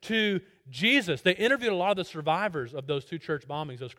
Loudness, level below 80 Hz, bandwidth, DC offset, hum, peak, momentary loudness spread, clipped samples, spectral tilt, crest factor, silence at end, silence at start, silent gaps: -27 LUFS; -68 dBFS; 16.5 kHz; under 0.1%; none; -8 dBFS; 11 LU; under 0.1%; -5 dB/octave; 20 dB; 0.05 s; 0 s; none